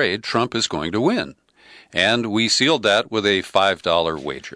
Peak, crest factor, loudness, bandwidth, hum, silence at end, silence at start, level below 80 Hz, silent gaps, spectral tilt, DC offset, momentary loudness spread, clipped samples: -4 dBFS; 16 dB; -19 LUFS; 11 kHz; none; 0 s; 0 s; -54 dBFS; none; -3.5 dB/octave; under 0.1%; 9 LU; under 0.1%